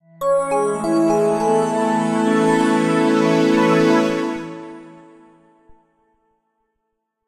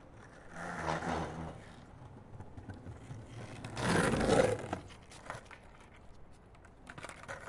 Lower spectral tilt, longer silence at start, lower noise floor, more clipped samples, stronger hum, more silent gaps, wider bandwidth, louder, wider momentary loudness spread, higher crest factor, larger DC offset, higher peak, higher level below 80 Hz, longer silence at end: about the same, -6 dB/octave vs -5 dB/octave; first, 0.2 s vs 0 s; first, -75 dBFS vs -57 dBFS; neither; neither; neither; first, 13.5 kHz vs 11.5 kHz; first, -17 LUFS vs -36 LUFS; second, 9 LU vs 25 LU; second, 14 dB vs 24 dB; neither; first, -4 dBFS vs -14 dBFS; about the same, -60 dBFS vs -56 dBFS; first, 2.35 s vs 0 s